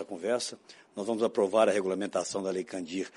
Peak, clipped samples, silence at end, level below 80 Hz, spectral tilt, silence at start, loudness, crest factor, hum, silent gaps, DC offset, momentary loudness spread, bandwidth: -12 dBFS; under 0.1%; 0.05 s; -78 dBFS; -4 dB/octave; 0 s; -30 LUFS; 20 dB; none; none; under 0.1%; 13 LU; 11.5 kHz